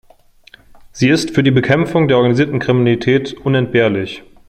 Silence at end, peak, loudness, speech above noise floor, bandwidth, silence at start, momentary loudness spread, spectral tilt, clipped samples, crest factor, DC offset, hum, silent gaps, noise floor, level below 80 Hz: 0.3 s; -2 dBFS; -14 LUFS; 33 dB; 11.5 kHz; 0.95 s; 5 LU; -6.5 dB/octave; under 0.1%; 14 dB; under 0.1%; none; none; -47 dBFS; -48 dBFS